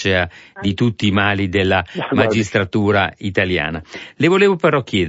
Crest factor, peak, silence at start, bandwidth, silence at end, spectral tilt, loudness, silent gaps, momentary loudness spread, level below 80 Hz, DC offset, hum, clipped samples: 16 dB; -2 dBFS; 0 s; 8 kHz; 0 s; -6 dB/octave; -17 LUFS; none; 10 LU; -46 dBFS; under 0.1%; none; under 0.1%